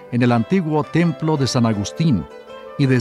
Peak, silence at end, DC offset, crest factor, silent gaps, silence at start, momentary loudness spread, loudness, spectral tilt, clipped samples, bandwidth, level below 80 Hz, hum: -4 dBFS; 0 s; under 0.1%; 16 dB; none; 0 s; 10 LU; -19 LUFS; -6.5 dB/octave; under 0.1%; 12 kHz; -50 dBFS; none